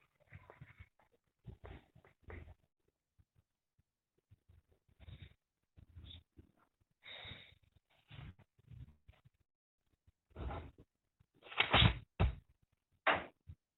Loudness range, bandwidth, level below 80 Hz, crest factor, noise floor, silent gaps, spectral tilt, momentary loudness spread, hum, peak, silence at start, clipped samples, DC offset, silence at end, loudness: 25 LU; 4.6 kHz; -52 dBFS; 30 dB; -86 dBFS; 9.55-9.78 s; -2.5 dB/octave; 28 LU; none; -14 dBFS; 0.35 s; under 0.1%; under 0.1%; 0.25 s; -36 LUFS